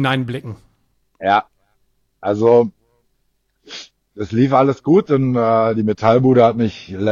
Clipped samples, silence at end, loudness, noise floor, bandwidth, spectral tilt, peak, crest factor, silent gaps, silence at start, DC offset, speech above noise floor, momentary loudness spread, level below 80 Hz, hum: under 0.1%; 0 s; -16 LUFS; -66 dBFS; 7.4 kHz; -8 dB/octave; 0 dBFS; 16 dB; none; 0 s; under 0.1%; 51 dB; 17 LU; -54 dBFS; none